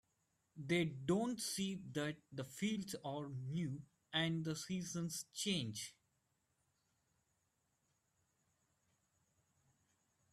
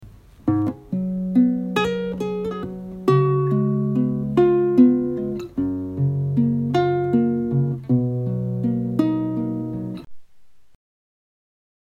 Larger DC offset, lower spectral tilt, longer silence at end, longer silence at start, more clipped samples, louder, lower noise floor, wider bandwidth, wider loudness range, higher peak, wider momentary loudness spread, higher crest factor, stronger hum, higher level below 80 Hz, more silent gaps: neither; second, -4.5 dB/octave vs -9 dB/octave; first, 4.4 s vs 1.25 s; first, 0.55 s vs 0 s; neither; second, -42 LUFS vs -21 LUFS; first, -84 dBFS vs -51 dBFS; first, 15.5 kHz vs 8.2 kHz; about the same, 6 LU vs 6 LU; second, -24 dBFS vs -4 dBFS; about the same, 9 LU vs 10 LU; about the same, 20 dB vs 18 dB; neither; second, -78 dBFS vs -50 dBFS; neither